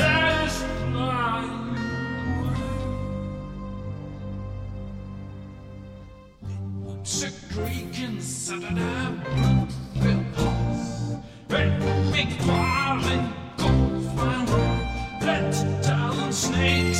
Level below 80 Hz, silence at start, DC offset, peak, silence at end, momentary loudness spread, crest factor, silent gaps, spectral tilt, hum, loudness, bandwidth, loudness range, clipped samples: -38 dBFS; 0 s; under 0.1%; -8 dBFS; 0 s; 14 LU; 18 dB; none; -5 dB/octave; none; -26 LUFS; 16 kHz; 11 LU; under 0.1%